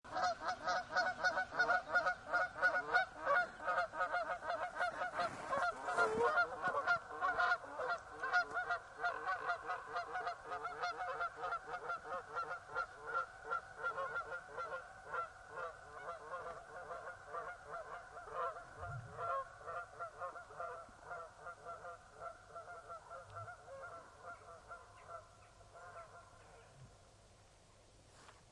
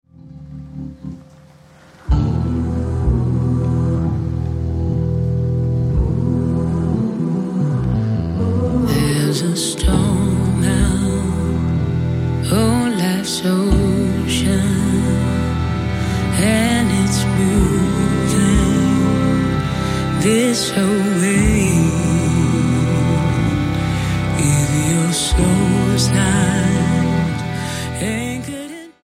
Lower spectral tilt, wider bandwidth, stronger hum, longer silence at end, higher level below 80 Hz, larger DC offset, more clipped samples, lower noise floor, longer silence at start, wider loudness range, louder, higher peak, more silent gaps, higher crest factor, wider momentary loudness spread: second, -3 dB/octave vs -5.5 dB/octave; second, 11.5 kHz vs 16 kHz; neither; second, 0 s vs 0.15 s; second, -70 dBFS vs -28 dBFS; neither; neither; first, -65 dBFS vs -45 dBFS; second, 0.05 s vs 0.25 s; first, 17 LU vs 3 LU; second, -40 LUFS vs -17 LUFS; second, -20 dBFS vs 0 dBFS; neither; first, 22 dB vs 16 dB; first, 18 LU vs 6 LU